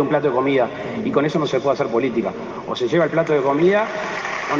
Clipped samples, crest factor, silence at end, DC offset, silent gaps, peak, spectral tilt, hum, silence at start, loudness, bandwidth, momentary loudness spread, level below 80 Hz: under 0.1%; 14 dB; 0 s; under 0.1%; none; -6 dBFS; -6.5 dB/octave; none; 0 s; -20 LUFS; 7.6 kHz; 8 LU; -58 dBFS